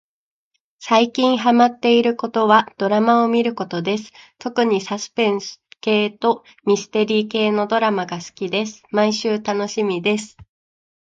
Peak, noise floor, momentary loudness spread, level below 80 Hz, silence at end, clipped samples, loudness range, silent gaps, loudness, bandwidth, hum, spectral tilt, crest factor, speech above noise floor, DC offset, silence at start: 0 dBFS; -71 dBFS; 10 LU; -66 dBFS; 0.65 s; under 0.1%; 5 LU; none; -19 LUFS; 7.8 kHz; none; -4.5 dB/octave; 18 dB; 53 dB; under 0.1%; 0.8 s